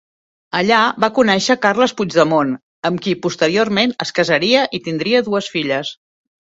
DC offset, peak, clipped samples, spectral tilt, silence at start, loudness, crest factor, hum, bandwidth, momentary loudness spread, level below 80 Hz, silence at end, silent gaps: under 0.1%; 0 dBFS; under 0.1%; -4.5 dB/octave; 0.55 s; -16 LUFS; 16 dB; none; 8 kHz; 8 LU; -58 dBFS; 0.65 s; 2.63-2.82 s